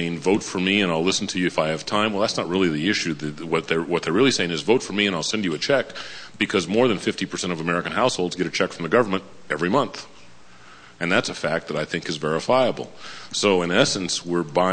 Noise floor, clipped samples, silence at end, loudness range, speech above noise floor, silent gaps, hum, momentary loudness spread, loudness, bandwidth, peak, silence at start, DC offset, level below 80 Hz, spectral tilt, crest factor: -49 dBFS; under 0.1%; 0 s; 3 LU; 27 dB; none; none; 7 LU; -22 LUFS; 9.8 kHz; -4 dBFS; 0 s; under 0.1%; -58 dBFS; -4 dB/octave; 20 dB